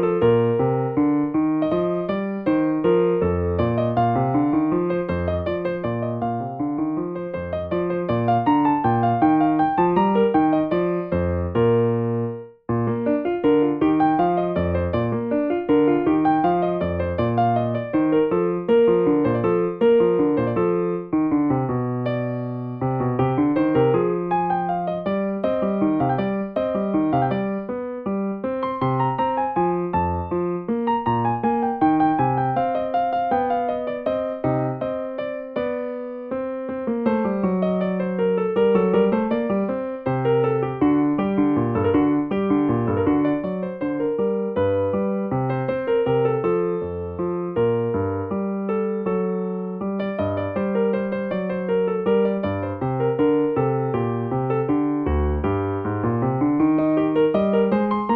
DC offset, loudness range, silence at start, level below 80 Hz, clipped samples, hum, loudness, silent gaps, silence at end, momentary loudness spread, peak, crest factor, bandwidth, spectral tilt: under 0.1%; 5 LU; 0 s; -44 dBFS; under 0.1%; none; -22 LUFS; none; 0 s; 7 LU; -6 dBFS; 14 dB; 4.6 kHz; -11 dB/octave